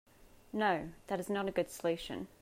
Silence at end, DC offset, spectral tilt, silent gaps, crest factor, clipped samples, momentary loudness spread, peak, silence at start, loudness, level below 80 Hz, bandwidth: 0.15 s; under 0.1%; -5 dB/octave; none; 18 dB; under 0.1%; 8 LU; -18 dBFS; 0.2 s; -36 LUFS; -62 dBFS; 16 kHz